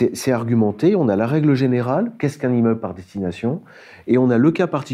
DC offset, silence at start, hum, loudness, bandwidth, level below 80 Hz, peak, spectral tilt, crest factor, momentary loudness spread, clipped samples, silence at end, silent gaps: under 0.1%; 0 s; none; -19 LUFS; 14 kHz; -60 dBFS; -4 dBFS; -7.5 dB/octave; 14 dB; 10 LU; under 0.1%; 0 s; none